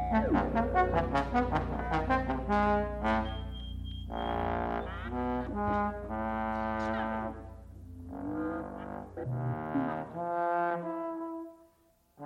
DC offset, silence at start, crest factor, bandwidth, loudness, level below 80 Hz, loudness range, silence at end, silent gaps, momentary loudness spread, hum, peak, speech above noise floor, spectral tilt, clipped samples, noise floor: under 0.1%; 0 s; 18 dB; 10 kHz; -33 LUFS; -44 dBFS; 7 LU; 0 s; none; 13 LU; none; -14 dBFS; 39 dB; -8 dB/octave; under 0.1%; -67 dBFS